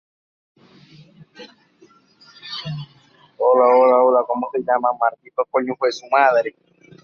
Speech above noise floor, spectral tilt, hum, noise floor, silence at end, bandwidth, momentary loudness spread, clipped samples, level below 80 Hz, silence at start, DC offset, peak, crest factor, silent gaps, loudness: 35 dB; -5.5 dB/octave; none; -53 dBFS; 0.55 s; 6.8 kHz; 17 LU; under 0.1%; -68 dBFS; 1.4 s; under 0.1%; -2 dBFS; 18 dB; none; -18 LUFS